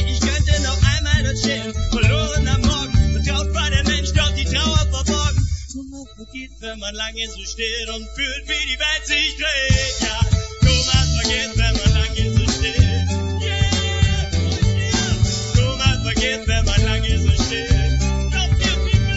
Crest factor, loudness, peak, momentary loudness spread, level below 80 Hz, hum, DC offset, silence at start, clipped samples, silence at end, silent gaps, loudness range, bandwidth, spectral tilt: 18 dB; -19 LUFS; 0 dBFS; 8 LU; -22 dBFS; none; 0.3%; 0 s; under 0.1%; 0 s; none; 5 LU; 8 kHz; -4 dB/octave